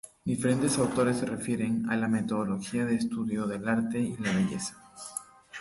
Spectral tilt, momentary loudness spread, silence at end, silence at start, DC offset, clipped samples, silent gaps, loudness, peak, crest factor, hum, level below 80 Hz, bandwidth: -5.5 dB/octave; 12 LU; 0 s; 0.05 s; under 0.1%; under 0.1%; none; -29 LUFS; -14 dBFS; 16 dB; none; -60 dBFS; 11.5 kHz